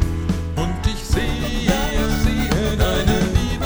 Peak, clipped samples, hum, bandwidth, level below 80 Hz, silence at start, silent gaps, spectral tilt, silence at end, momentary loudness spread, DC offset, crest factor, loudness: -2 dBFS; under 0.1%; none; over 20 kHz; -24 dBFS; 0 s; none; -5.5 dB/octave; 0 s; 5 LU; under 0.1%; 16 dB; -20 LUFS